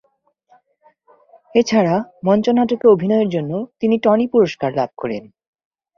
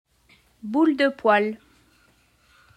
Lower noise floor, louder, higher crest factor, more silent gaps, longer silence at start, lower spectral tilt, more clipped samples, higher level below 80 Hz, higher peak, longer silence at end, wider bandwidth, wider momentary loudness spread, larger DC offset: about the same, -63 dBFS vs -61 dBFS; first, -17 LUFS vs -21 LUFS; about the same, 16 dB vs 18 dB; neither; first, 1.55 s vs 0.65 s; about the same, -6.5 dB/octave vs -6 dB/octave; neither; first, -60 dBFS vs -68 dBFS; first, -2 dBFS vs -6 dBFS; second, 0.75 s vs 1.2 s; second, 7.2 kHz vs 10.5 kHz; second, 9 LU vs 19 LU; neither